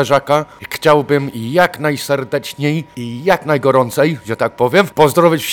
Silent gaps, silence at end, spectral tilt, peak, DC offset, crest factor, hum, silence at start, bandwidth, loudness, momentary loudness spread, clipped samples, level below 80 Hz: none; 0 s; -5.5 dB/octave; 0 dBFS; under 0.1%; 14 dB; none; 0 s; 19.5 kHz; -15 LUFS; 8 LU; 0.2%; -52 dBFS